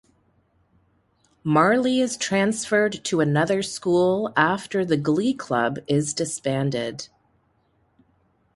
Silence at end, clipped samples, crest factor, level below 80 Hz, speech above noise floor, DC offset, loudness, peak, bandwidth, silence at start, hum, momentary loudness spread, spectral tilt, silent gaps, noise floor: 1.5 s; under 0.1%; 20 dB; -62 dBFS; 44 dB; under 0.1%; -22 LUFS; -4 dBFS; 11.5 kHz; 1.45 s; none; 6 LU; -5 dB/octave; none; -65 dBFS